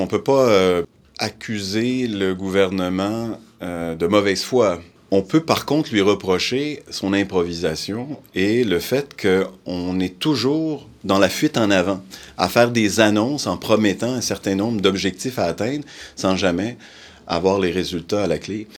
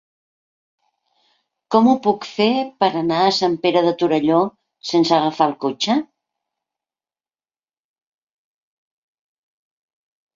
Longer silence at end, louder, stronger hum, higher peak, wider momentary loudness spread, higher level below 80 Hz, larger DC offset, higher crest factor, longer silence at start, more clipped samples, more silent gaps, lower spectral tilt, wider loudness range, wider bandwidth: second, 0.05 s vs 4.3 s; about the same, -20 LUFS vs -18 LUFS; neither; about the same, 0 dBFS vs -2 dBFS; first, 10 LU vs 5 LU; first, -52 dBFS vs -64 dBFS; neither; about the same, 20 dB vs 20 dB; second, 0 s vs 1.7 s; neither; neither; about the same, -5 dB/octave vs -5.5 dB/octave; second, 3 LU vs 8 LU; first, 19.5 kHz vs 7.6 kHz